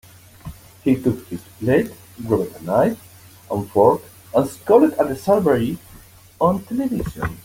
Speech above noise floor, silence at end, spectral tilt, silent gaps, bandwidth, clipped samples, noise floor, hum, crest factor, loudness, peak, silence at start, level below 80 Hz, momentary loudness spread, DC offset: 26 dB; 0.05 s; -7.5 dB/octave; none; 17 kHz; under 0.1%; -45 dBFS; none; 18 dB; -20 LUFS; -2 dBFS; 0.45 s; -46 dBFS; 18 LU; under 0.1%